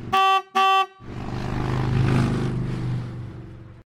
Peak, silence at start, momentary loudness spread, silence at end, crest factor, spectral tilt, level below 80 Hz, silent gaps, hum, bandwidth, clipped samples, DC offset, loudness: -8 dBFS; 0 s; 17 LU; 0.15 s; 16 dB; -6 dB/octave; -38 dBFS; none; none; 14 kHz; under 0.1%; under 0.1%; -23 LUFS